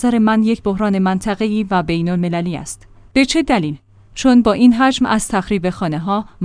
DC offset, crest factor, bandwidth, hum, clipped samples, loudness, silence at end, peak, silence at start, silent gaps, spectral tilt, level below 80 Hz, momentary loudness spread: under 0.1%; 16 dB; 10.5 kHz; none; under 0.1%; -16 LUFS; 0 s; 0 dBFS; 0 s; none; -5.5 dB/octave; -40 dBFS; 12 LU